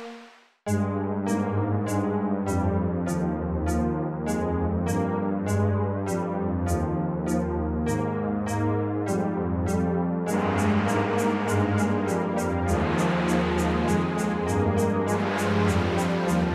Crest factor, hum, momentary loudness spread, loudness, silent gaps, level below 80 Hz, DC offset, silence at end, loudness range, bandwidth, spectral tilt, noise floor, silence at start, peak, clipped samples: 14 dB; none; 4 LU; -26 LUFS; none; -42 dBFS; under 0.1%; 0 s; 2 LU; 14 kHz; -7 dB/octave; -50 dBFS; 0 s; -12 dBFS; under 0.1%